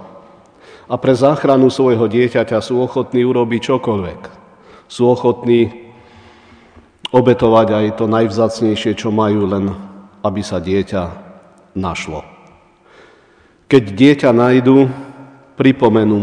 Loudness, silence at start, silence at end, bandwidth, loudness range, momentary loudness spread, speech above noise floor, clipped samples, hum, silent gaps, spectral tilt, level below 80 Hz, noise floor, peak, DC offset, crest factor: -14 LUFS; 0 s; 0 s; 10 kHz; 7 LU; 13 LU; 37 dB; 0.2%; none; none; -7 dB/octave; -48 dBFS; -50 dBFS; 0 dBFS; under 0.1%; 14 dB